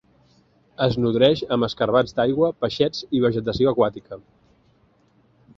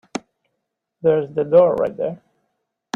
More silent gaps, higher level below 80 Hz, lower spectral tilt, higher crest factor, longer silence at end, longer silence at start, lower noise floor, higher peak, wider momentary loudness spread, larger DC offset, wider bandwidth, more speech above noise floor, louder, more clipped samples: neither; first, -52 dBFS vs -60 dBFS; about the same, -7 dB/octave vs -6.5 dB/octave; about the same, 20 dB vs 18 dB; first, 1.4 s vs 0.8 s; first, 0.8 s vs 0.15 s; second, -60 dBFS vs -77 dBFS; about the same, -4 dBFS vs -2 dBFS; second, 6 LU vs 18 LU; neither; about the same, 7.4 kHz vs 7.6 kHz; second, 39 dB vs 60 dB; second, -21 LUFS vs -18 LUFS; neither